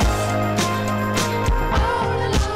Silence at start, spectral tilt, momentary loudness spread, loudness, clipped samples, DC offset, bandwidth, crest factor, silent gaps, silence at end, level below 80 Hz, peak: 0 s; -5 dB/octave; 1 LU; -21 LUFS; under 0.1%; under 0.1%; 16 kHz; 10 dB; none; 0 s; -26 dBFS; -10 dBFS